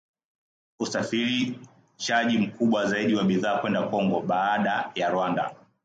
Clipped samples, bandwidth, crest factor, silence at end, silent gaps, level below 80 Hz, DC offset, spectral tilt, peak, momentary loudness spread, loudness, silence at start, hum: under 0.1%; 9 kHz; 16 dB; 0.3 s; none; -68 dBFS; under 0.1%; -5 dB/octave; -10 dBFS; 7 LU; -25 LUFS; 0.8 s; none